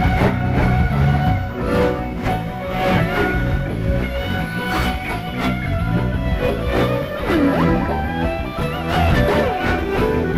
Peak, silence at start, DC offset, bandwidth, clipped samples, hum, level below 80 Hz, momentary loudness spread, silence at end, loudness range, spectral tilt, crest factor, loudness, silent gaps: -6 dBFS; 0 s; under 0.1%; 16 kHz; under 0.1%; none; -26 dBFS; 6 LU; 0 s; 2 LU; -7 dB/octave; 14 dB; -19 LUFS; none